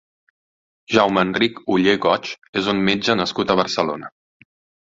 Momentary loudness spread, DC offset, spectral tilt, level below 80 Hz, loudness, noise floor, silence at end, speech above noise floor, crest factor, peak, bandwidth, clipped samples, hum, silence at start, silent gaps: 7 LU; under 0.1%; -5 dB/octave; -56 dBFS; -19 LUFS; under -90 dBFS; 0.75 s; over 71 dB; 20 dB; 0 dBFS; 7.8 kHz; under 0.1%; none; 0.9 s; 2.49-2.53 s